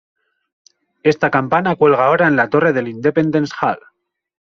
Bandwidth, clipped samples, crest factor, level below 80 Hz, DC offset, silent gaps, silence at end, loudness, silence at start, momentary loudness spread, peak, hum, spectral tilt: 7 kHz; under 0.1%; 16 dB; -56 dBFS; under 0.1%; none; 0.8 s; -15 LUFS; 1.05 s; 7 LU; -2 dBFS; none; -5 dB/octave